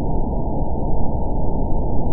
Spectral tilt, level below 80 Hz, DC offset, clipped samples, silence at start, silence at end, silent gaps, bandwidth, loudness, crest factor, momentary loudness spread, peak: -17.5 dB/octave; -22 dBFS; 5%; under 0.1%; 0 s; 0 s; none; 1.1 kHz; -24 LUFS; 12 dB; 1 LU; -4 dBFS